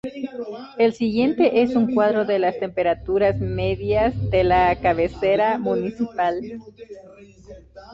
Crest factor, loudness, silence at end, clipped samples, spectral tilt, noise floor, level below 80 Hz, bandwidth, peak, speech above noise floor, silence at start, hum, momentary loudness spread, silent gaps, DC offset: 16 dB; -21 LUFS; 0 s; under 0.1%; -8 dB/octave; -44 dBFS; -42 dBFS; 7.6 kHz; -6 dBFS; 24 dB; 0.05 s; none; 14 LU; none; under 0.1%